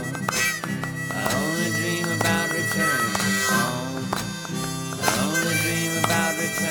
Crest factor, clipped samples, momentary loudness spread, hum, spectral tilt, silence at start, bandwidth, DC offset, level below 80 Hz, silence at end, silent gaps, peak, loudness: 18 dB; under 0.1%; 7 LU; none; -3.5 dB/octave; 0 s; over 20 kHz; under 0.1%; -52 dBFS; 0 s; none; -6 dBFS; -23 LUFS